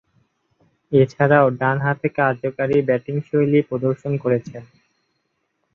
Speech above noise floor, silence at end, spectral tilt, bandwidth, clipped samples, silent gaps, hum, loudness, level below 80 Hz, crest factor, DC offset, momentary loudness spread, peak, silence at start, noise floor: 53 dB; 1.1 s; -9 dB/octave; 6.8 kHz; under 0.1%; none; none; -19 LUFS; -60 dBFS; 18 dB; under 0.1%; 8 LU; -2 dBFS; 0.9 s; -72 dBFS